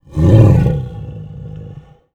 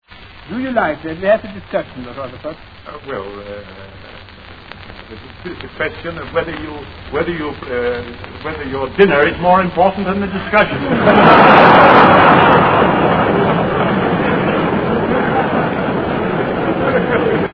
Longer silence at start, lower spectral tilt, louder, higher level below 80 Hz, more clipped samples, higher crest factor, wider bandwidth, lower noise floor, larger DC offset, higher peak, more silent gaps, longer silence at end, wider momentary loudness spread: about the same, 0.15 s vs 0.2 s; about the same, -9.5 dB/octave vs -8.5 dB/octave; about the same, -11 LUFS vs -13 LUFS; first, -28 dBFS vs -40 dBFS; second, under 0.1% vs 0.2%; about the same, 14 dB vs 14 dB; first, 7.4 kHz vs 5.4 kHz; about the same, -36 dBFS vs -35 dBFS; second, under 0.1% vs 0.3%; about the same, 0 dBFS vs 0 dBFS; neither; first, 0.45 s vs 0 s; about the same, 22 LU vs 23 LU